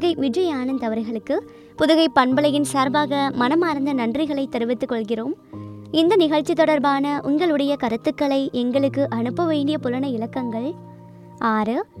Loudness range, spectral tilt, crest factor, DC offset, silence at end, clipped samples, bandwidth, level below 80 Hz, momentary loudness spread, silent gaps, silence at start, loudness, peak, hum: 3 LU; -5.5 dB/octave; 20 dB; under 0.1%; 0 s; under 0.1%; 13.5 kHz; -60 dBFS; 9 LU; none; 0 s; -21 LUFS; -2 dBFS; none